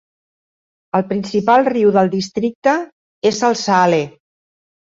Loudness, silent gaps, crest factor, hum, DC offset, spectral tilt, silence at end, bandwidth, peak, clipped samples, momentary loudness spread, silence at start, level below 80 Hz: -16 LUFS; 2.55-2.62 s, 2.92-3.22 s; 16 dB; none; under 0.1%; -5 dB/octave; 0.85 s; 7.8 kHz; -2 dBFS; under 0.1%; 8 LU; 0.95 s; -60 dBFS